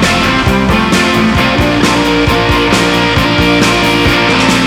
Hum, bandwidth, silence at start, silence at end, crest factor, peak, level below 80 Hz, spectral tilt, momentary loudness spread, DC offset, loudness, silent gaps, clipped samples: none; 19 kHz; 0 s; 0 s; 10 dB; 0 dBFS; -24 dBFS; -4.5 dB/octave; 1 LU; under 0.1%; -9 LUFS; none; under 0.1%